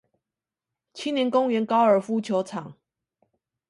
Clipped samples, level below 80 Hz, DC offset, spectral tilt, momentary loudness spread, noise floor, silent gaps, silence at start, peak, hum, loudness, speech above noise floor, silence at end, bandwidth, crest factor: under 0.1%; -76 dBFS; under 0.1%; -6 dB/octave; 14 LU; -89 dBFS; none; 0.95 s; -8 dBFS; none; -24 LUFS; 66 dB; 1 s; 11.5 kHz; 18 dB